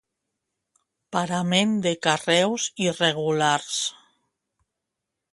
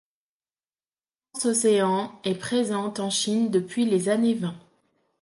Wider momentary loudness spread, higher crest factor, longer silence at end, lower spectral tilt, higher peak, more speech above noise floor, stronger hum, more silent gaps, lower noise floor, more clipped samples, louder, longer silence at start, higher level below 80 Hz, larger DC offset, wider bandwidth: about the same, 7 LU vs 9 LU; first, 22 dB vs 16 dB; first, 1.4 s vs 0.65 s; about the same, -3.5 dB/octave vs -4.5 dB/octave; first, -4 dBFS vs -10 dBFS; second, 61 dB vs over 66 dB; neither; neither; second, -84 dBFS vs under -90 dBFS; neither; about the same, -23 LUFS vs -24 LUFS; second, 1.1 s vs 1.35 s; about the same, -68 dBFS vs -72 dBFS; neither; about the same, 11.5 kHz vs 11.5 kHz